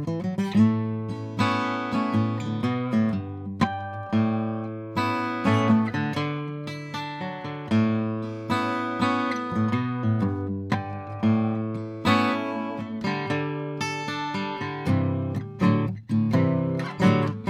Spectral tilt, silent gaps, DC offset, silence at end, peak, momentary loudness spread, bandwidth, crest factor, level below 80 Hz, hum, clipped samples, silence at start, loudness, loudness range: -7 dB/octave; none; under 0.1%; 0 s; -8 dBFS; 10 LU; 11.5 kHz; 18 dB; -62 dBFS; none; under 0.1%; 0 s; -26 LUFS; 2 LU